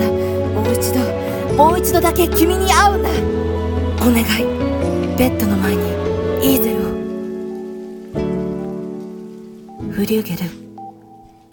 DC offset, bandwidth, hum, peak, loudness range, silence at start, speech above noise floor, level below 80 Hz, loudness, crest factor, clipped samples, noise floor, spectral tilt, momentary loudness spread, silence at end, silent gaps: under 0.1%; 19 kHz; none; 0 dBFS; 9 LU; 0 s; 29 dB; -30 dBFS; -17 LUFS; 18 dB; under 0.1%; -43 dBFS; -5.5 dB/octave; 17 LU; 0.3 s; none